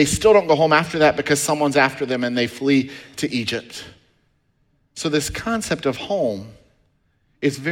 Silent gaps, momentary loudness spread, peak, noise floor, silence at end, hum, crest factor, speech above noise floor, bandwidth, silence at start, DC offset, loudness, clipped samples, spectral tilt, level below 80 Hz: none; 13 LU; -2 dBFS; -64 dBFS; 0 s; none; 18 dB; 45 dB; 17 kHz; 0 s; under 0.1%; -19 LUFS; under 0.1%; -4 dB/octave; -48 dBFS